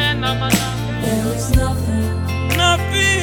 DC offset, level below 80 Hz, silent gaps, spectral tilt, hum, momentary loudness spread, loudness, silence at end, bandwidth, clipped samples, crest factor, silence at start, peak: under 0.1%; -28 dBFS; none; -4.5 dB/octave; none; 6 LU; -18 LUFS; 0 s; 19 kHz; under 0.1%; 16 dB; 0 s; 0 dBFS